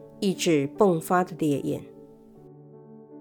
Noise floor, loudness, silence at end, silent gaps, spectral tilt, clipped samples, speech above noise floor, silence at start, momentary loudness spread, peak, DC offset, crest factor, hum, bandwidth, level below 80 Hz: -49 dBFS; -25 LUFS; 0 s; none; -5.5 dB/octave; under 0.1%; 25 dB; 0 s; 8 LU; -8 dBFS; under 0.1%; 18 dB; none; 19.5 kHz; -64 dBFS